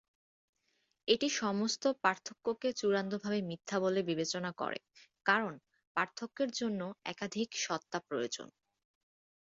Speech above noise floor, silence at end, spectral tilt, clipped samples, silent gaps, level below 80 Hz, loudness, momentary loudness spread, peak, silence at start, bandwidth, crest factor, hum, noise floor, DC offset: 44 dB; 1.1 s; -3 dB/octave; under 0.1%; 5.87-5.95 s; -78 dBFS; -35 LUFS; 9 LU; -14 dBFS; 1.05 s; 7.6 kHz; 22 dB; none; -79 dBFS; under 0.1%